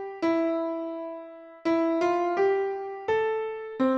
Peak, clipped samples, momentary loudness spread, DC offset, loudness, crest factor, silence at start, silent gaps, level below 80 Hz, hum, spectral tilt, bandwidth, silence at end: -14 dBFS; under 0.1%; 11 LU; under 0.1%; -27 LUFS; 14 dB; 0 s; none; -68 dBFS; none; -5.5 dB/octave; 7.2 kHz; 0 s